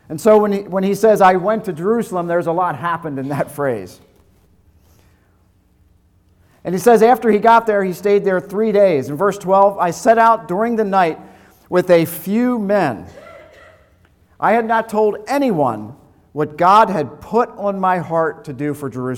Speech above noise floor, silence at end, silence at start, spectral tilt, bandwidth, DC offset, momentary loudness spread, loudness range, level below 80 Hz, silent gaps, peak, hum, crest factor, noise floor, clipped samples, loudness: 40 dB; 0 s; 0.1 s; -6.5 dB/octave; 18.5 kHz; under 0.1%; 12 LU; 8 LU; -56 dBFS; none; -2 dBFS; none; 14 dB; -55 dBFS; under 0.1%; -16 LUFS